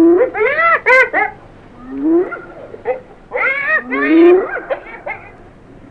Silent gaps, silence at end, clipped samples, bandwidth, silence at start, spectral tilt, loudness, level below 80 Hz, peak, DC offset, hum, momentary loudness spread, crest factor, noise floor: none; 0.6 s; under 0.1%; 6.6 kHz; 0 s; -6 dB/octave; -13 LUFS; -48 dBFS; 0 dBFS; 0.1%; none; 18 LU; 14 dB; -39 dBFS